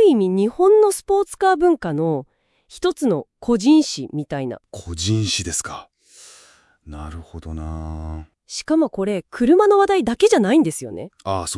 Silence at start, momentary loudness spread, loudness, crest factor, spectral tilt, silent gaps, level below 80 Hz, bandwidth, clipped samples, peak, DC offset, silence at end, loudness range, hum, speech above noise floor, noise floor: 0 s; 19 LU; -18 LUFS; 16 dB; -5 dB/octave; none; -44 dBFS; 12 kHz; under 0.1%; -2 dBFS; under 0.1%; 0 s; 9 LU; none; 33 dB; -52 dBFS